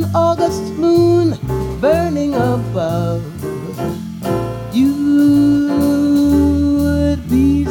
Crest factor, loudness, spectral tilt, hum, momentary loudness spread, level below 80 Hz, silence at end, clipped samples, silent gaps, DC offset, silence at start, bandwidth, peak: 12 dB; -15 LUFS; -7.5 dB/octave; none; 11 LU; -32 dBFS; 0 s; under 0.1%; none; under 0.1%; 0 s; 17.5 kHz; -2 dBFS